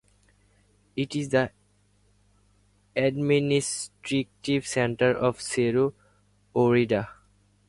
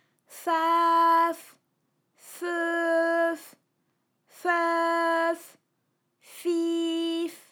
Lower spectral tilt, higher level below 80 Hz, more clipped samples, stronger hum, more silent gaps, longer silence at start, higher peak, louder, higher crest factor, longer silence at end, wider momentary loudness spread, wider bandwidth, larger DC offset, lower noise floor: first, -5 dB/octave vs -1.5 dB/octave; first, -60 dBFS vs under -90 dBFS; neither; first, 50 Hz at -55 dBFS vs none; neither; first, 0.95 s vs 0.3 s; first, -8 dBFS vs -12 dBFS; about the same, -26 LUFS vs -26 LUFS; about the same, 18 dB vs 16 dB; first, 0.55 s vs 0.15 s; second, 10 LU vs 14 LU; second, 11.5 kHz vs 18.5 kHz; neither; second, -64 dBFS vs -76 dBFS